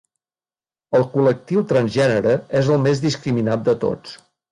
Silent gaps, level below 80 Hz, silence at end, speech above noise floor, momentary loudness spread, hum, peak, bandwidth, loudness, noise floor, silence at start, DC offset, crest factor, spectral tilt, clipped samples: none; -54 dBFS; 0.35 s; over 72 dB; 5 LU; none; -6 dBFS; 11 kHz; -19 LUFS; under -90 dBFS; 0.9 s; under 0.1%; 14 dB; -7 dB/octave; under 0.1%